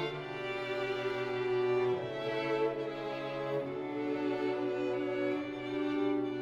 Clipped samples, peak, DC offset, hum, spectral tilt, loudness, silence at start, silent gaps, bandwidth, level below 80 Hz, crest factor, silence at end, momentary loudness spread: under 0.1%; -22 dBFS; under 0.1%; none; -6.5 dB/octave; -35 LUFS; 0 s; none; 8 kHz; -68 dBFS; 12 dB; 0 s; 6 LU